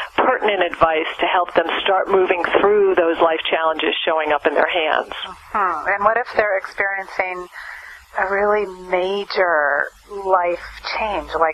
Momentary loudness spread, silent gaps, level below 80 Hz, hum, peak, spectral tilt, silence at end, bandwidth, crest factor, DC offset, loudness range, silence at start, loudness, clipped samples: 10 LU; none; -50 dBFS; none; -2 dBFS; -4.5 dB/octave; 0 s; 12.5 kHz; 18 dB; under 0.1%; 4 LU; 0 s; -18 LUFS; under 0.1%